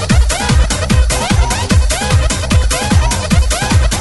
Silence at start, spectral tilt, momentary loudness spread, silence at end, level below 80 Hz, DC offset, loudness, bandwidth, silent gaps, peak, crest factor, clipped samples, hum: 0 s; -4.5 dB/octave; 1 LU; 0 s; -14 dBFS; 0.4%; -13 LUFS; 12 kHz; none; 0 dBFS; 12 dB; under 0.1%; none